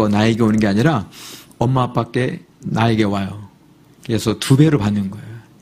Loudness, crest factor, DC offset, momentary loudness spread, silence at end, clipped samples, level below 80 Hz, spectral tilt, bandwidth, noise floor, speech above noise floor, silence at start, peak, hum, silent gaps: -17 LUFS; 18 dB; under 0.1%; 20 LU; 0.2 s; under 0.1%; -46 dBFS; -6.5 dB/octave; 15.5 kHz; -49 dBFS; 32 dB; 0 s; 0 dBFS; none; none